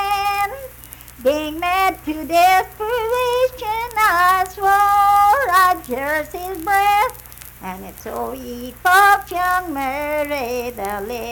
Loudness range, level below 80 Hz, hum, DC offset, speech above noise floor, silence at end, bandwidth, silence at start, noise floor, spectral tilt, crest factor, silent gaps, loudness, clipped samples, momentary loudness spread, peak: 3 LU; -44 dBFS; none; under 0.1%; 21 dB; 0 s; 19 kHz; 0 s; -39 dBFS; -3 dB/octave; 14 dB; none; -17 LUFS; under 0.1%; 18 LU; -4 dBFS